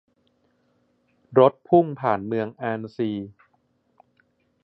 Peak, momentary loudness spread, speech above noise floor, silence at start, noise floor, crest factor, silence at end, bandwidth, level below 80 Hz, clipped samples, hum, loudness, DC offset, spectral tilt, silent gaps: -2 dBFS; 11 LU; 46 dB; 1.3 s; -68 dBFS; 22 dB; 1.35 s; 5.8 kHz; -66 dBFS; under 0.1%; none; -23 LUFS; under 0.1%; -10 dB/octave; none